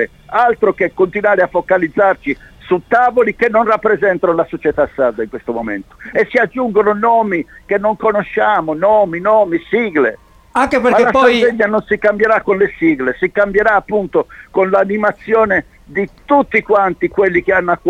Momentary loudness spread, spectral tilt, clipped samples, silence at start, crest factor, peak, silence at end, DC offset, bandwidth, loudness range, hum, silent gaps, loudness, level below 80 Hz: 8 LU; -6.5 dB/octave; under 0.1%; 0 s; 14 dB; 0 dBFS; 0 s; under 0.1%; 10 kHz; 3 LU; none; none; -14 LUFS; -44 dBFS